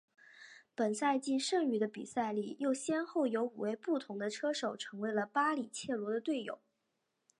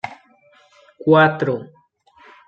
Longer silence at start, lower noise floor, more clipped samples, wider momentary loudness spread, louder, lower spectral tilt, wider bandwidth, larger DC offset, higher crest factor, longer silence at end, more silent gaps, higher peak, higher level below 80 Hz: first, 0.35 s vs 0.05 s; first, -84 dBFS vs -54 dBFS; neither; second, 7 LU vs 15 LU; second, -36 LUFS vs -17 LUFS; second, -4 dB/octave vs -8 dB/octave; first, 11 kHz vs 7.2 kHz; neither; about the same, 18 dB vs 18 dB; about the same, 0.85 s vs 0.8 s; neither; second, -18 dBFS vs -2 dBFS; second, -86 dBFS vs -66 dBFS